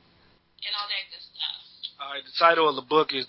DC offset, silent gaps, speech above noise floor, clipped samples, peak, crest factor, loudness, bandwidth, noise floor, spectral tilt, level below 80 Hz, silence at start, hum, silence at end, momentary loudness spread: under 0.1%; none; 38 dB; under 0.1%; -4 dBFS; 22 dB; -25 LUFS; 5.8 kHz; -61 dBFS; -7 dB/octave; -76 dBFS; 0.6 s; none; 0 s; 17 LU